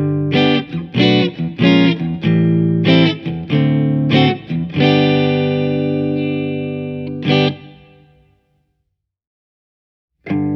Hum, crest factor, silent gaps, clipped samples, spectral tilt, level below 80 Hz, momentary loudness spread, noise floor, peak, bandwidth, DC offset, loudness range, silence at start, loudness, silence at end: none; 16 dB; 9.27-10.08 s; under 0.1%; -8 dB/octave; -52 dBFS; 10 LU; -72 dBFS; 0 dBFS; 6.2 kHz; under 0.1%; 9 LU; 0 s; -15 LUFS; 0 s